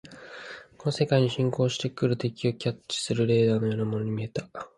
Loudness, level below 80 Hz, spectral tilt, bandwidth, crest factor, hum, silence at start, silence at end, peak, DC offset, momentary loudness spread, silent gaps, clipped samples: -27 LUFS; -62 dBFS; -6 dB/octave; 11.5 kHz; 18 dB; none; 0.05 s; 0.1 s; -8 dBFS; under 0.1%; 16 LU; none; under 0.1%